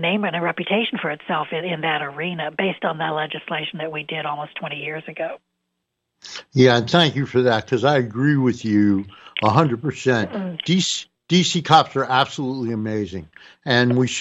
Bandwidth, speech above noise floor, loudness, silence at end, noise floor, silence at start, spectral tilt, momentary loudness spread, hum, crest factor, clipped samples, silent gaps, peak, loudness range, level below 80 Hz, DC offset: 8.8 kHz; 57 dB; -20 LUFS; 0 s; -77 dBFS; 0 s; -5 dB/octave; 13 LU; none; 20 dB; under 0.1%; none; -2 dBFS; 7 LU; -62 dBFS; under 0.1%